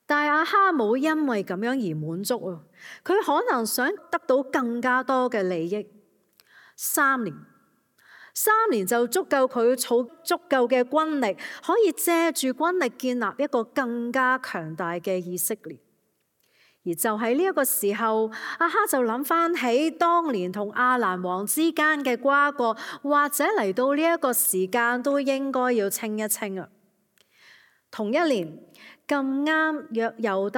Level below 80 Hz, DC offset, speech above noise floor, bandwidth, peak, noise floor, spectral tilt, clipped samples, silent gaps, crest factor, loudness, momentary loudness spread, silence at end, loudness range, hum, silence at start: -84 dBFS; under 0.1%; 47 dB; 17.5 kHz; -8 dBFS; -71 dBFS; -3.5 dB/octave; under 0.1%; none; 16 dB; -24 LUFS; 9 LU; 0 s; 5 LU; none; 0.1 s